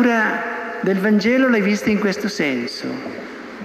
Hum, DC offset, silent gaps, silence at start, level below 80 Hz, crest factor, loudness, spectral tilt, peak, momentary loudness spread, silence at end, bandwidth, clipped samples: none; under 0.1%; none; 0 s; -58 dBFS; 14 dB; -19 LUFS; -5.5 dB/octave; -4 dBFS; 13 LU; 0 s; 13.5 kHz; under 0.1%